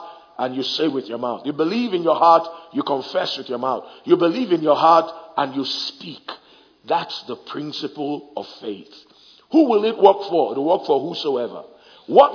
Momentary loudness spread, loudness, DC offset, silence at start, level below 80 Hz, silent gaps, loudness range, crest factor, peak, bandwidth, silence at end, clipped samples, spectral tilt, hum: 17 LU; -20 LUFS; under 0.1%; 0 s; -72 dBFS; none; 8 LU; 20 dB; 0 dBFS; 5.4 kHz; 0 s; under 0.1%; -6 dB/octave; none